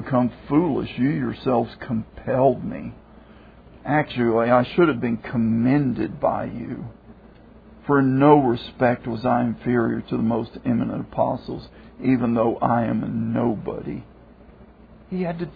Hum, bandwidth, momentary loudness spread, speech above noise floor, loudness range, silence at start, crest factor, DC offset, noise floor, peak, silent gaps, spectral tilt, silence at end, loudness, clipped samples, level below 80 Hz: none; 5 kHz; 14 LU; 26 dB; 4 LU; 0 s; 20 dB; under 0.1%; -47 dBFS; -2 dBFS; none; -11 dB/octave; 0 s; -22 LUFS; under 0.1%; -48 dBFS